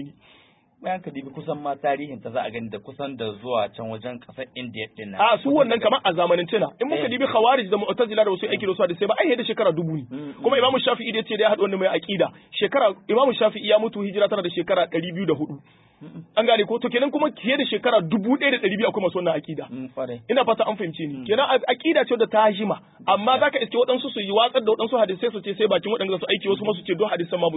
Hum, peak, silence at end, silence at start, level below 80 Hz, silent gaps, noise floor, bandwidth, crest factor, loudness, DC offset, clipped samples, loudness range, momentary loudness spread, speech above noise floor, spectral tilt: none; -4 dBFS; 0 s; 0 s; -68 dBFS; none; -56 dBFS; 4 kHz; 18 dB; -22 LUFS; under 0.1%; under 0.1%; 6 LU; 13 LU; 34 dB; -10 dB/octave